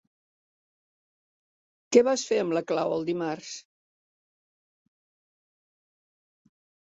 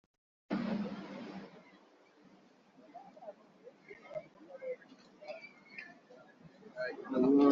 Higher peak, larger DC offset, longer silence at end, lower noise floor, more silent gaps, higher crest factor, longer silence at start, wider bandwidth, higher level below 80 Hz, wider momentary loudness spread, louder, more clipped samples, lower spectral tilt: first, -6 dBFS vs -16 dBFS; neither; first, 3.25 s vs 0 s; first, under -90 dBFS vs -64 dBFS; neither; about the same, 24 dB vs 22 dB; first, 1.9 s vs 0.5 s; first, 8 kHz vs 6.6 kHz; about the same, -76 dBFS vs -80 dBFS; second, 15 LU vs 22 LU; first, -26 LUFS vs -38 LUFS; neither; second, -4 dB/octave vs -6 dB/octave